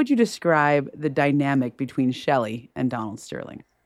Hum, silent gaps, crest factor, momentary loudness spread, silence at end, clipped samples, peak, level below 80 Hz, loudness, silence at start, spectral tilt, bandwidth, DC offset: none; none; 16 dB; 14 LU; 0.3 s; under 0.1%; -6 dBFS; -66 dBFS; -23 LUFS; 0 s; -6.5 dB/octave; 13 kHz; under 0.1%